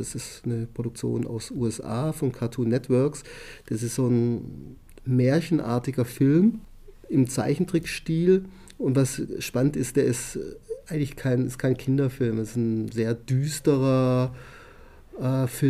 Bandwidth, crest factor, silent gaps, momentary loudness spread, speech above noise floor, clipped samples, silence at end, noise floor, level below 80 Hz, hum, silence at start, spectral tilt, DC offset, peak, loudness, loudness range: 15 kHz; 16 dB; none; 12 LU; 23 dB; under 0.1%; 0 s; -48 dBFS; -50 dBFS; none; 0 s; -7 dB/octave; under 0.1%; -8 dBFS; -25 LUFS; 3 LU